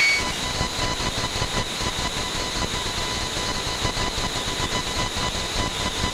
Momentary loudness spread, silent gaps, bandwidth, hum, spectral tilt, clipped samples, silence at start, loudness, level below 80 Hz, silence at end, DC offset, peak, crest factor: 1 LU; none; 16 kHz; none; -2.5 dB/octave; under 0.1%; 0 s; -24 LUFS; -34 dBFS; 0 s; under 0.1%; -10 dBFS; 16 dB